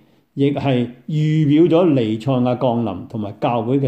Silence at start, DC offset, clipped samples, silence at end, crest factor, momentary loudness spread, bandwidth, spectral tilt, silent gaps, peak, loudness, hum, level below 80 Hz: 0.35 s; under 0.1%; under 0.1%; 0 s; 14 dB; 11 LU; 8.4 kHz; -9 dB/octave; none; -4 dBFS; -18 LUFS; none; -58 dBFS